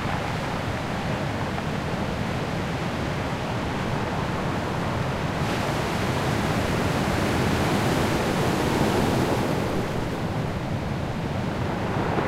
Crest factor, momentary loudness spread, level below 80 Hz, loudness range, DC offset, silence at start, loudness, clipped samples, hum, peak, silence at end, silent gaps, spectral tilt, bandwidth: 14 dB; 5 LU; -40 dBFS; 4 LU; under 0.1%; 0 s; -26 LUFS; under 0.1%; none; -10 dBFS; 0 s; none; -6 dB/octave; 16 kHz